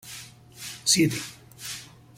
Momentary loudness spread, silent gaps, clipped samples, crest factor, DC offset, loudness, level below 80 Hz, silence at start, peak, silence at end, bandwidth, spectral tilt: 20 LU; none; under 0.1%; 22 dB; under 0.1%; -25 LUFS; -62 dBFS; 0.05 s; -8 dBFS; 0.3 s; 16.5 kHz; -2.5 dB/octave